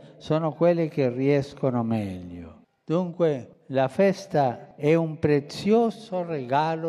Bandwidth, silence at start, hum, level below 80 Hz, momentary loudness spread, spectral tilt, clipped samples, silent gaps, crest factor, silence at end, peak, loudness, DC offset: 12.5 kHz; 0.05 s; none; -60 dBFS; 8 LU; -7.5 dB/octave; under 0.1%; none; 16 dB; 0 s; -8 dBFS; -25 LUFS; under 0.1%